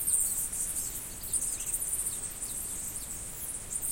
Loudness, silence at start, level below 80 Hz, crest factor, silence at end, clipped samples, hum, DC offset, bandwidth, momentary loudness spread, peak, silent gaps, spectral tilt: -31 LUFS; 0 s; -50 dBFS; 20 dB; 0 s; under 0.1%; none; under 0.1%; 17 kHz; 8 LU; -14 dBFS; none; -1 dB/octave